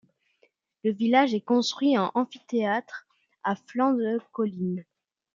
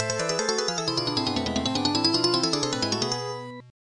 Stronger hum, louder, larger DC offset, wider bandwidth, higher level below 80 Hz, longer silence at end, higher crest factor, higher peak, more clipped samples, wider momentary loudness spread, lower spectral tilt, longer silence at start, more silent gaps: neither; about the same, -26 LUFS vs -25 LUFS; neither; second, 7.6 kHz vs 11.5 kHz; second, -78 dBFS vs -58 dBFS; first, 0.5 s vs 0.15 s; about the same, 20 dB vs 20 dB; about the same, -6 dBFS vs -6 dBFS; neither; first, 10 LU vs 7 LU; first, -5.5 dB/octave vs -3 dB/octave; first, 0.85 s vs 0 s; neither